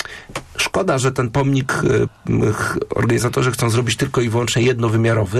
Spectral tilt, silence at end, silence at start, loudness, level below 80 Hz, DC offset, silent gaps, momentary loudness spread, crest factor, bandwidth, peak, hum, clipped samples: -5.5 dB/octave; 0 s; 0 s; -18 LUFS; -42 dBFS; under 0.1%; none; 4 LU; 10 dB; 13 kHz; -8 dBFS; none; under 0.1%